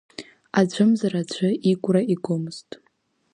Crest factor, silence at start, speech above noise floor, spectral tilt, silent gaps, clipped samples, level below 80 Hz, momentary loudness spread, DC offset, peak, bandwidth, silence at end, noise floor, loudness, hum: 18 dB; 0.2 s; 46 dB; -6.5 dB/octave; none; under 0.1%; -70 dBFS; 17 LU; under 0.1%; -4 dBFS; 10.5 kHz; 0.75 s; -67 dBFS; -22 LUFS; none